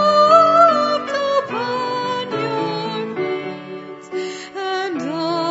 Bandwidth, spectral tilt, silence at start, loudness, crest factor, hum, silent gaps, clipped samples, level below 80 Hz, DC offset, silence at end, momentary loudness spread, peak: 8 kHz; -5 dB/octave; 0 s; -18 LUFS; 18 dB; none; none; under 0.1%; -70 dBFS; under 0.1%; 0 s; 17 LU; 0 dBFS